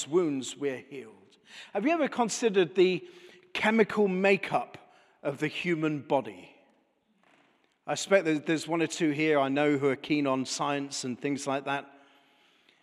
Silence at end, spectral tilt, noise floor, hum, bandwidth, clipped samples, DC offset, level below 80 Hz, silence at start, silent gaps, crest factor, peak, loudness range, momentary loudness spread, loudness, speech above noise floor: 0.95 s; -4.5 dB/octave; -70 dBFS; none; 13 kHz; under 0.1%; under 0.1%; -80 dBFS; 0 s; none; 22 dB; -8 dBFS; 5 LU; 12 LU; -28 LUFS; 42 dB